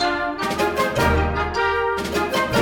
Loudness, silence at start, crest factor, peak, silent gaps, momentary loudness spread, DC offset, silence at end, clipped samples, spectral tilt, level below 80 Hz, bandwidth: -21 LUFS; 0 s; 14 dB; -6 dBFS; none; 4 LU; under 0.1%; 0 s; under 0.1%; -5 dB/octave; -32 dBFS; 19 kHz